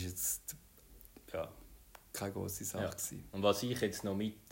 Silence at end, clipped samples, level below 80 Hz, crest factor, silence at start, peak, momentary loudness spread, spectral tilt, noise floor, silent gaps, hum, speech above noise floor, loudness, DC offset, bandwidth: 0 s; under 0.1%; -62 dBFS; 22 dB; 0 s; -18 dBFS; 24 LU; -4 dB/octave; -59 dBFS; none; none; 22 dB; -38 LUFS; under 0.1%; 16.5 kHz